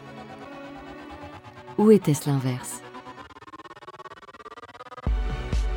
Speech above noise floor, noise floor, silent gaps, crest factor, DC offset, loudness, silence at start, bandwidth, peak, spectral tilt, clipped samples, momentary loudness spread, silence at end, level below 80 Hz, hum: 24 dB; -44 dBFS; none; 22 dB; under 0.1%; -24 LUFS; 0 s; 19 kHz; -6 dBFS; -6.5 dB/octave; under 0.1%; 24 LU; 0 s; -36 dBFS; none